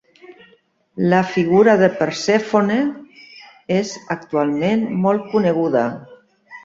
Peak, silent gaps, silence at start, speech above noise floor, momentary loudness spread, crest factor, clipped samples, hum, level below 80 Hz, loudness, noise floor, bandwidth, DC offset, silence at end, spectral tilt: -2 dBFS; none; 0.3 s; 39 dB; 12 LU; 16 dB; under 0.1%; none; -60 dBFS; -18 LUFS; -56 dBFS; 7.8 kHz; under 0.1%; 0.05 s; -6.5 dB/octave